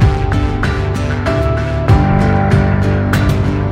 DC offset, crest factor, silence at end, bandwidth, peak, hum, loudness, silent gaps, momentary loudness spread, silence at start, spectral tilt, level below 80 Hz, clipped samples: under 0.1%; 12 dB; 0 s; 15 kHz; 0 dBFS; none; -14 LUFS; none; 5 LU; 0 s; -7.5 dB/octave; -20 dBFS; under 0.1%